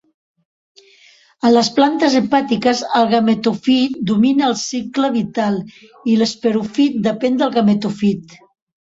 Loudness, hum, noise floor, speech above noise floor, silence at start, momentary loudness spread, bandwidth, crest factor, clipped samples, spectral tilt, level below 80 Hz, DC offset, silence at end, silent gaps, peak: -16 LUFS; none; -50 dBFS; 34 dB; 1.45 s; 6 LU; 8 kHz; 14 dB; under 0.1%; -5 dB/octave; -58 dBFS; under 0.1%; 0.55 s; none; -2 dBFS